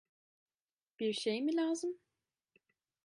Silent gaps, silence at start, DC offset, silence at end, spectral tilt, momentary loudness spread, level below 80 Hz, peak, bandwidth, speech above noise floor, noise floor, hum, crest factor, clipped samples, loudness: none; 1 s; under 0.1%; 1.1 s; -4 dB/octave; 8 LU; under -90 dBFS; -24 dBFS; 11.5 kHz; over 55 dB; under -90 dBFS; none; 16 dB; under 0.1%; -36 LUFS